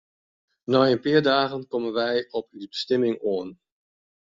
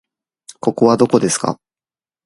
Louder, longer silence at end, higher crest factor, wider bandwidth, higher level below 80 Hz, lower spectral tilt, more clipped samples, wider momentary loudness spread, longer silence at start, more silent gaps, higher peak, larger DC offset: second, -24 LUFS vs -16 LUFS; about the same, 0.8 s vs 0.7 s; about the same, 18 dB vs 18 dB; second, 7.6 kHz vs 11.5 kHz; second, -66 dBFS vs -58 dBFS; second, -3.5 dB/octave vs -5 dB/octave; neither; first, 13 LU vs 10 LU; about the same, 0.7 s vs 0.65 s; neither; second, -6 dBFS vs 0 dBFS; neither